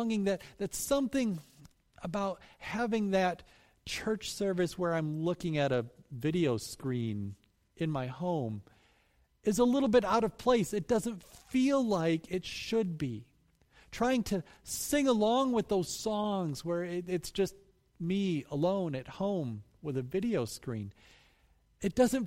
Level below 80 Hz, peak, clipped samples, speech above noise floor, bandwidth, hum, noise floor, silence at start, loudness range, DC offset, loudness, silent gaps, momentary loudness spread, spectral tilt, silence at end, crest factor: -58 dBFS; -14 dBFS; under 0.1%; 38 dB; 16 kHz; none; -70 dBFS; 0 s; 5 LU; under 0.1%; -33 LUFS; none; 12 LU; -5.5 dB/octave; 0 s; 18 dB